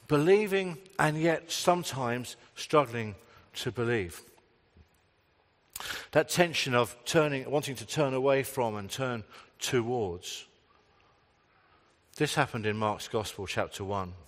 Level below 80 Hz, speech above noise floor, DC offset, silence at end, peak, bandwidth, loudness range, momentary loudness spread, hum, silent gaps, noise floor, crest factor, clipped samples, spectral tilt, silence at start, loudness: -66 dBFS; 39 dB; under 0.1%; 0.05 s; -6 dBFS; 16 kHz; 7 LU; 14 LU; none; none; -68 dBFS; 24 dB; under 0.1%; -4.5 dB/octave; 0.1 s; -30 LUFS